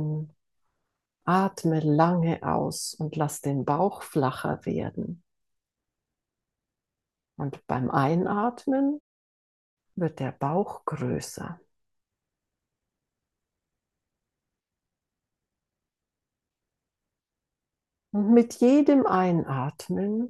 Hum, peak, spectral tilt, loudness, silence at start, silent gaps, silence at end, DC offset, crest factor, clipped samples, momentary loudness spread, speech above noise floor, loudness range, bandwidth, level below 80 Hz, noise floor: none; -6 dBFS; -7 dB/octave; -26 LUFS; 0 s; 9.00-9.77 s; 0 s; under 0.1%; 22 dB; under 0.1%; 15 LU; 63 dB; 13 LU; 12.5 kHz; -66 dBFS; -88 dBFS